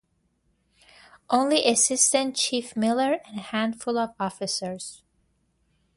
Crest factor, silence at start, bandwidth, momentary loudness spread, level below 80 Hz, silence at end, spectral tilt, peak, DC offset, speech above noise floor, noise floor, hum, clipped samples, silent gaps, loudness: 22 dB; 1.3 s; 11.5 kHz; 11 LU; -68 dBFS; 1 s; -2 dB/octave; -4 dBFS; under 0.1%; 45 dB; -70 dBFS; none; under 0.1%; none; -24 LUFS